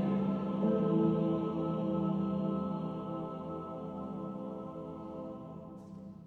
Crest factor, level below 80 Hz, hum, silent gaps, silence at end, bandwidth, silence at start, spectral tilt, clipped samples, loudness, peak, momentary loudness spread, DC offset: 16 dB; -64 dBFS; none; none; 0 s; 4.4 kHz; 0 s; -10.5 dB/octave; under 0.1%; -35 LUFS; -18 dBFS; 15 LU; under 0.1%